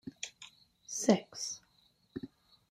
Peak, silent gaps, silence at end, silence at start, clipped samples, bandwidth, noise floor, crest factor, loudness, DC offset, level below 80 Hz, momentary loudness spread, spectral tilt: -12 dBFS; none; 0.45 s; 0.05 s; under 0.1%; 15.5 kHz; -70 dBFS; 26 dB; -35 LUFS; under 0.1%; -76 dBFS; 24 LU; -4 dB/octave